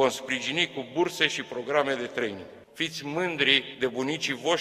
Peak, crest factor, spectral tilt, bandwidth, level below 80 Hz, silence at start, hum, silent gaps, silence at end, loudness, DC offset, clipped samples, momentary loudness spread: -4 dBFS; 24 dB; -3 dB/octave; 15.5 kHz; -70 dBFS; 0 s; none; none; 0 s; -27 LUFS; under 0.1%; under 0.1%; 10 LU